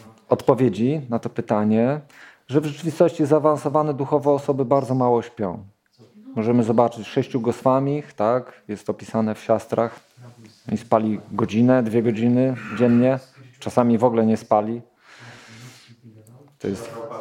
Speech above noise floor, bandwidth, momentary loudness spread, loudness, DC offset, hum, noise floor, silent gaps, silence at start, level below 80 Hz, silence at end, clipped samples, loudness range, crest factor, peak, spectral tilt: 31 dB; 12 kHz; 12 LU; -21 LUFS; under 0.1%; none; -51 dBFS; none; 0.3 s; -64 dBFS; 0 s; under 0.1%; 4 LU; 20 dB; -2 dBFS; -8 dB/octave